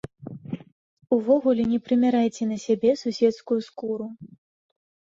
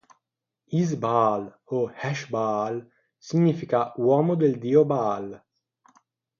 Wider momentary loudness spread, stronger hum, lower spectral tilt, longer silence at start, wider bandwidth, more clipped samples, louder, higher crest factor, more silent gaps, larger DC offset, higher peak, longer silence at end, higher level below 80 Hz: first, 17 LU vs 11 LU; neither; second, -6.5 dB/octave vs -8 dB/octave; second, 0.2 s vs 0.7 s; about the same, 7.6 kHz vs 7.2 kHz; neither; about the same, -23 LUFS vs -24 LUFS; about the same, 16 dB vs 18 dB; first, 0.72-0.97 s vs none; neither; about the same, -8 dBFS vs -8 dBFS; second, 0.85 s vs 1 s; first, -64 dBFS vs -70 dBFS